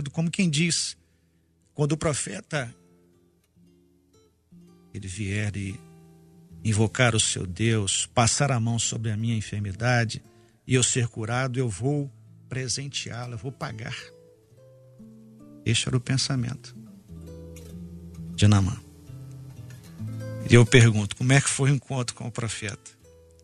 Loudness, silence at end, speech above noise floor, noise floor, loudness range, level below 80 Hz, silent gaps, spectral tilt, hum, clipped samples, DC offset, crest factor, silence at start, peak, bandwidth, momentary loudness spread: -25 LUFS; 0.55 s; 41 dB; -65 dBFS; 12 LU; -52 dBFS; none; -4.5 dB/octave; none; under 0.1%; under 0.1%; 24 dB; 0 s; -4 dBFS; 11.5 kHz; 22 LU